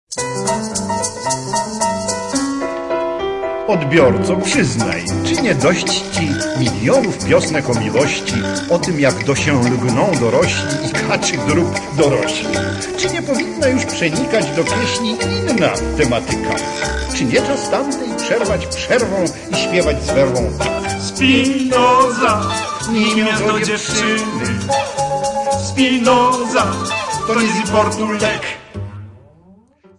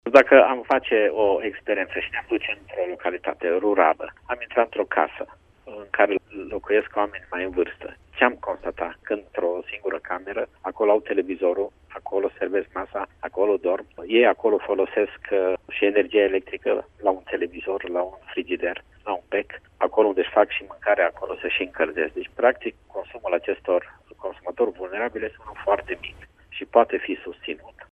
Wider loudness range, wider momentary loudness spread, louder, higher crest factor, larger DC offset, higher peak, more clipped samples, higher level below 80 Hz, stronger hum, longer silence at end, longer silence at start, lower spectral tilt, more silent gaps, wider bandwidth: about the same, 3 LU vs 5 LU; second, 7 LU vs 13 LU; first, -16 LUFS vs -24 LUFS; second, 16 dB vs 24 dB; neither; about the same, 0 dBFS vs 0 dBFS; neither; first, -38 dBFS vs -56 dBFS; neither; first, 0.8 s vs 0.1 s; about the same, 0.1 s vs 0.05 s; about the same, -4.5 dB/octave vs -5.5 dB/octave; neither; first, 11.5 kHz vs 6.6 kHz